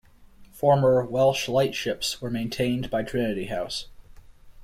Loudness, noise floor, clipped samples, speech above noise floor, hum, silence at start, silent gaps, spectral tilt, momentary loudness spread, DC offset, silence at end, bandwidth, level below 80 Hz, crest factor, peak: -25 LUFS; -50 dBFS; under 0.1%; 26 dB; none; 0.2 s; none; -5 dB/octave; 10 LU; under 0.1%; 0 s; 16 kHz; -50 dBFS; 18 dB; -8 dBFS